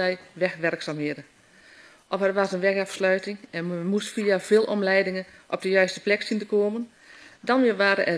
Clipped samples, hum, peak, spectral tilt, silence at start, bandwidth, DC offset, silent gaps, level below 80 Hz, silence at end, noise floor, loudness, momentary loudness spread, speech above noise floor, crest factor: under 0.1%; none; -6 dBFS; -5 dB/octave; 0 s; 11 kHz; under 0.1%; none; -74 dBFS; 0 s; -53 dBFS; -25 LUFS; 12 LU; 28 dB; 20 dB